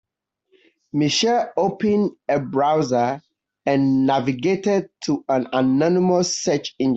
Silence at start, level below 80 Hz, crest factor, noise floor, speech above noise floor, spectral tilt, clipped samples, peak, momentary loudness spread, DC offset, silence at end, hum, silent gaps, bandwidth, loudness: 0.95 s; -62 dBFS; 16 dB; -69 dBFS; 49 dB; -5 dB/octave; under 0.1%; -6 dBFS; 6 LU; under 0.1%; 0 s; none; none; 8.2 kHz; -20 LUFS